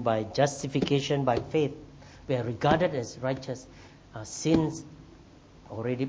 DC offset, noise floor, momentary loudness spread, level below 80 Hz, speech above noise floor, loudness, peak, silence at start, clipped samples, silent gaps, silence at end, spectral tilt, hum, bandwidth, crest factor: under 0.1%; -53 dBFS; 20 LU; -54 dBFS; 25 dB; -28 LUFS; -8 dBFS; 0 s; under 0.1%; none; 0 s; -5.5 dB/octave; none; 8 kHz; 22 dB